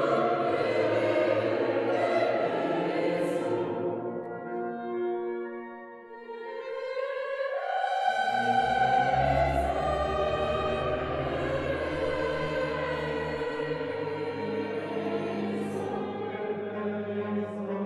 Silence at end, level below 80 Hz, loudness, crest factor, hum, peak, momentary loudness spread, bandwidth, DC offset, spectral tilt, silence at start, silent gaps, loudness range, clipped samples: 0 s; -48 dBFS; -29 LUFS; 16 dB; none; -14 dBFS; 9 LU; 12.5 kHz; under 0.1%; -6.5 dB/octave; 0 s; none; 7 LU; under 0.1%